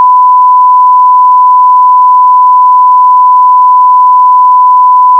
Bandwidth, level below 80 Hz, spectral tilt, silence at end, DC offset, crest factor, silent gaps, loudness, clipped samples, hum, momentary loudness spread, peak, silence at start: 1.2 kHz; under -90 dBFS; 2 dB/octave; 0 s; under 0.1%; 4 dB; none; -3 LUFS; 4%; none; 0 LU; 0 dBFS; 0 s